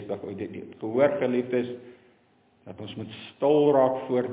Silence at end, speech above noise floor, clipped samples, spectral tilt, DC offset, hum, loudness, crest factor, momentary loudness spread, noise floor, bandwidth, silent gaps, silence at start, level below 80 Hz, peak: 0 s; 37 dB; under 0.1%; -10.5 dB/octave; under 0.1%; none; -25 LUFS; 18 dB; 19 LU; -63 dBFS; 4 kHz; none; 0 s; -68 dBFS; -10 dBFS